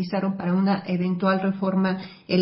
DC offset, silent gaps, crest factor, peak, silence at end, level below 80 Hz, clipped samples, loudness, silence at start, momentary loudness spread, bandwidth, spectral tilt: under 0.1%; none; 16 dB; -8 dBFS; 0 s; -66 dBFS; under 0.1%; -24 LUFS; 0 s; 4 LU; 5.8 kHz; -11.5 dB/octave